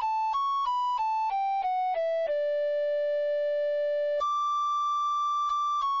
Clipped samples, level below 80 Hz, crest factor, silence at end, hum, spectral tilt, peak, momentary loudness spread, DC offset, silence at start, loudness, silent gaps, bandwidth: under 0.1%; -70 dBFS; 4 dB; 0 s; none; 0.5 dB/octave; -22 dBFS; 1 LU; under 0.1%; 0 s; -28 LUFS; none; 7.4 kHz